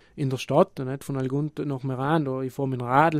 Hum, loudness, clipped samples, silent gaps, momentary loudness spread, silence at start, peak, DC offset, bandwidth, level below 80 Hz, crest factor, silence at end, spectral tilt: none; -26 LUFS; under 0.1%; none; 7 LU; 0.15 s; -4 dBFS; under 0.1%; 15 kHz; -60 dBFS; 20 dB; 0 s; -7.5 dB/octave